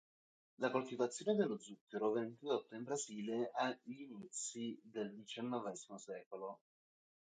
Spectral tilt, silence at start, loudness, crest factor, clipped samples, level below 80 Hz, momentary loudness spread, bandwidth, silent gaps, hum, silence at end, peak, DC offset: -4 dB/octave; 0.6 s; -43 LUFS; 20 dB; under 0.1%; under -90 dBFS; 12 LU; 9.4 kHz; 1.81-1.87 s, 6.26-6.31 s; none; 0.65 s; -24 dBFS; under 0.1%